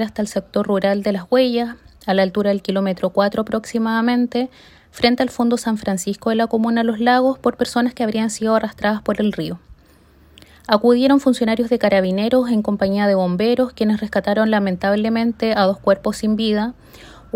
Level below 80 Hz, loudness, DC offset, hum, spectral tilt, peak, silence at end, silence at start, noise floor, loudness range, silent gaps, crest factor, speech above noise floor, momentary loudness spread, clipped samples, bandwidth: -50 dBFS; -18 LUFS; under 0.1%; none; -5.5 dB/octave; -2 dBFS; 0.25 s; 0 s; -50 dBFS; 3 LU; none; 18 dB; 32 dB; 6 LU; under 0.1%; 16 kHz